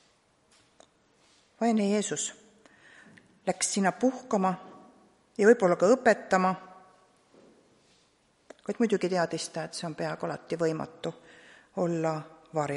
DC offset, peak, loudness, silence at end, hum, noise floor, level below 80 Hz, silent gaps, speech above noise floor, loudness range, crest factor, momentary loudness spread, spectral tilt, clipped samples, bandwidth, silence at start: under 0.1%; -8 dBFS; -28 LUFS; 0 s; none; -67 dBFS; -74 dBFS; none; 40 dB; 7 LU; 22 dB; 16 LU; -4.5 dB/octave; under 0.1%; 11.5 kHz; 1.6 s